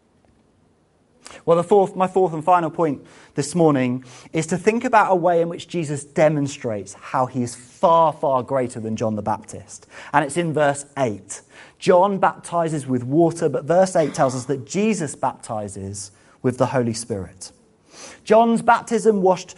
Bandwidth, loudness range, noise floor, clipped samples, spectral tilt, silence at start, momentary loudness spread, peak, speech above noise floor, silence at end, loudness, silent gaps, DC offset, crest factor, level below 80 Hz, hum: 11.5 kHz; 4 LU; -60 dBFS; under 0.1%; -6 dB/octave; 1.3 s; 15 LU; 0 dBFS; 40 dB; 0.05 s; -20 LUFS; none; under 0.1%; 20 dB; -60 dBFS; none